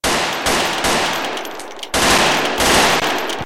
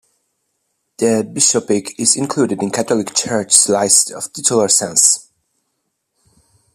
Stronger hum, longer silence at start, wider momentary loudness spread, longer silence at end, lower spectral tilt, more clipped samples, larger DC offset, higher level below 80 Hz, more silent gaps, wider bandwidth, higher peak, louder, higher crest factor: neither; second, 0 s vs 1 s; first, 11 LU vs 8 LU; second, 0 s vs 1.55 s; about the same, -2 dB/octave vs -2.5 dB/octave; neither; first, 1% vs under 0.1%; first, -38 dBFS vs -62 dBFS; neither; second, 17 kHz vs over 20 kHz; about the same, -2 dBFS vs 0 dBFS; about the same, -15 LUFS vs -14 LUFS; about the same, 14 dB vs 18 dB